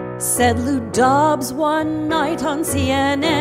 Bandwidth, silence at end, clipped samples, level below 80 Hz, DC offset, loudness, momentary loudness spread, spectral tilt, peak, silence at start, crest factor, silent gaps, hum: 16.5 kHz; 0 s; under 0.1%; -42 dBFS; under 0.1%; -18 LUFS; 5 LU; -4 dB/octave; -4 dBFS; 0 s; 14 dB; none; none